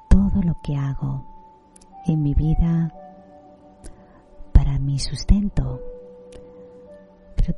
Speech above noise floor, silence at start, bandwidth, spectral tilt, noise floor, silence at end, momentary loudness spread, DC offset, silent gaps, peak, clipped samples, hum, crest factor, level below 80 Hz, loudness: 28 dB; 0.1 s; 11 kHz; -7.5 dB/octave; -49 dBFS; 0 s; 23 LU; under 0.1%; none; -2 dBFS; under 0.1%; none; 20 dB; -24 dBFS; -23 LUFS